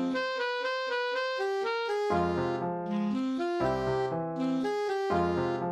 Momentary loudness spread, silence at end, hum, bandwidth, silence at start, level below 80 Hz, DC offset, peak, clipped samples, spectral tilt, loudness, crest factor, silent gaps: 3 LU; 0 s; none; 12 kHz; 0 s; -56 dBFS; under 0.1%; -16 dBFS; under 0.1%; -6 dB/octave; -30 LUFS; 14 dB; none